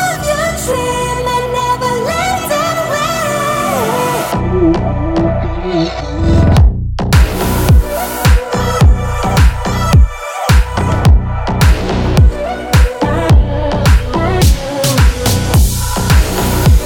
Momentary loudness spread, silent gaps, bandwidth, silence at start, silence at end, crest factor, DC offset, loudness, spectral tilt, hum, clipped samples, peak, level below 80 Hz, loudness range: 5 LU; none; 18 kHz; 0 s; 0 s; 10 dB; under 0.1%; -13 LUFS; -5.5 dB/octave; none; under 0.1%; 0 dBFS; -14 dBFS; 3 LU